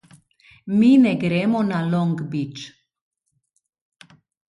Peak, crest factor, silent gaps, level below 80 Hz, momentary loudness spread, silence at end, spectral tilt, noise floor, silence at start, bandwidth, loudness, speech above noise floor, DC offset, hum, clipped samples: -6 dBFS; 16 dB; none; -64 dBFS; 21 LU; 1.85 s; -7.5 dB/octave; -71 dBFS; 0.65 s; 11 kHz; -19 LUFS; 52 dB; under 0.1%; none; under 0.1%